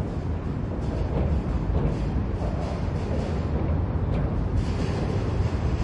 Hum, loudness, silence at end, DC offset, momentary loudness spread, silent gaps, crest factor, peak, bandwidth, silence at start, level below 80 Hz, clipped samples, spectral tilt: none; -27 LUFS; 0 s; under 0.1%; 3 LU; none; 14 dB; -12 dBFS; 9.6 kHz; 0 s; -30 dBFS; under 0.1%; -8.5 dB/octave